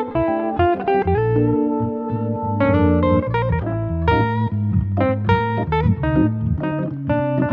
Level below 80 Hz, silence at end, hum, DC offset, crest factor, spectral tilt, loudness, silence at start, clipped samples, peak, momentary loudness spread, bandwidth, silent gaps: -34 dBFS; 0 s; none; under 0.1%; 16 dB; -10.5 dB/octave; -19 LUFS; 0 s; under 0.1%; -4 dBFS; 6 LU; 5 kHz; none